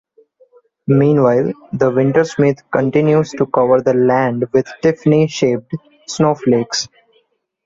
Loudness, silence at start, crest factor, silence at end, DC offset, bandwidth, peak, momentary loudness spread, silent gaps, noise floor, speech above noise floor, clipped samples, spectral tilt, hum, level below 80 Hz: -15 LUFS; 0.9 s; 14 dB; 0.8 s; under 0.1%; 7.8 kHz; -2 dBFS; 9 LU; none; -60 dBFS; 46 dB; under 0.1%; -6.5 dB/octave; none; -54 dBFS